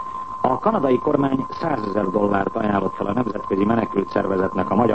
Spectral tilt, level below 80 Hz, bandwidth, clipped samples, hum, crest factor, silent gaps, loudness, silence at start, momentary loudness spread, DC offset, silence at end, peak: -8.5 dB/octave; -50 dBFS; 8.4 kHz; under 0.1%; none; 16 dB; none; -21 LUFS; 0 s; 5 LU; 0.8%; 0 s; -4 dBFS